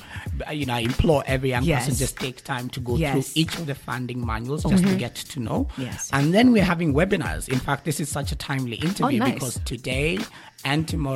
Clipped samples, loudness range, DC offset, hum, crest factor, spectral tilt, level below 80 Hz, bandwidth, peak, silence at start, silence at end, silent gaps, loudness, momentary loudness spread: under 0.1%; 4 LU; under 0.1%; none; 18 dB; -5.5 dB/octave; -38 dBFS; 16.5 kHz; -6 dBFS; 0 s; 0 s; none; -24 LUFS; 10 LU